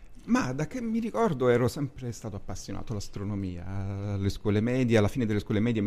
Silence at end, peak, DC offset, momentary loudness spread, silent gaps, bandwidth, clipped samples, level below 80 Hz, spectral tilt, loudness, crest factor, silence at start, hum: 0 s; -10 dBFS; under 0.1%; 13 LU; none; 14.5 kHz; under 0.1%; -46 dBFS; -7 dB/octave; -29 LUFS; 18 dB; 0 s; none